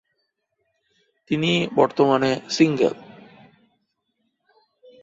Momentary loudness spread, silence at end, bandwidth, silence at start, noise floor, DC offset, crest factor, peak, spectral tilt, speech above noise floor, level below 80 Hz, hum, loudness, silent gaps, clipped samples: 6 LU; 2 s; 7.8 kHz; 1.3 s; -74 dBFS; under 0.1%; 20 dB; -4 dBFS; -5.5 dB/octave; 55 dB; -64 dBFS; none; -20 LUFS; none; under 0.1%